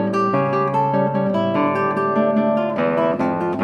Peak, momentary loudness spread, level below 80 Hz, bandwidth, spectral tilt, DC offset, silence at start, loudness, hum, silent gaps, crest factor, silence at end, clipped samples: -6 dBFS; 2 LU; -64 dBFS; 9.2 kHz; -8.5 dB/octave; under 0.1%; 0 s; -19 LUFS; none; none; 12 dB; 0 s; under 0.1%